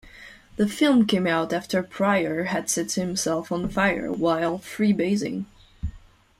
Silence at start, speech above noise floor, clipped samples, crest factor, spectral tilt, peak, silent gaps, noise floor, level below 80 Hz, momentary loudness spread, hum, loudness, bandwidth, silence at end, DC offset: 0.05 s; 24 dB; under 0.1%; 16 dB; -4.5 dB/octave; -8 dBFS; none; -47 dBFS; -48 dBFS; 17 LU; none; -24 LUFS; 15.5 kHz; 0.4 s; under 0.1%